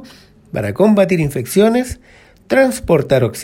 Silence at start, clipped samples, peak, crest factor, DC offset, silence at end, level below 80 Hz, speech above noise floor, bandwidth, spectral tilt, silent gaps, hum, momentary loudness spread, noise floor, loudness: 0 s; under 0.1%; 0 dBFS; 14 dB; under 0.1%; 0 s; -40 dBFS; 28 dB; 16.5 kHz; -6 dB/octave; none; none; 12 LU; -42 dBFS; -15 LUFS